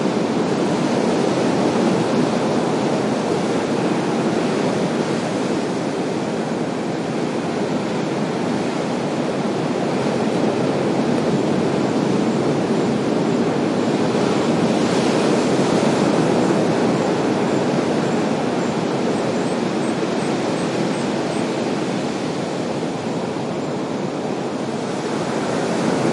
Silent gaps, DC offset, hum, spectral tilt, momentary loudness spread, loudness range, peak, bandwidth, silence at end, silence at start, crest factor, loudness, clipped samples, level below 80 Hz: none; under 0.1%; none; -6 dB/octave; 6 LU; 5 LU; -4 dBFS; 11.5 kHz; 0 s; 0 s; 16 dB; -20 LUFS; under 0.1%; -60 dBFS